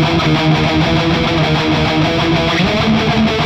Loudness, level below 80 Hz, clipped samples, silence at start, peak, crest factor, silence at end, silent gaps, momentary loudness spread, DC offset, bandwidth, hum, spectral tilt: -13 LUFS; -30 dBFS; under 0.1%; 0 s; -2 dBFS; 10 dB; 0 s; none; 1 LU; under 0.1%; 9.6 kHz; none; -6 dB/octave